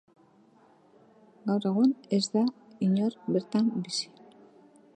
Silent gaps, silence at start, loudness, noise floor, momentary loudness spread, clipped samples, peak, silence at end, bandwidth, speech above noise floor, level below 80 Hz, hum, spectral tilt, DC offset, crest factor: none; 1.45 s; -28 LUFS; -60 dBFS; 8 LU; under 0.1%; -12 dBFS; 0.9 s; 9.8 kHz; 33 dB; -80 dBFS; none; -6 dB/octave; under 0.1%; 18 dB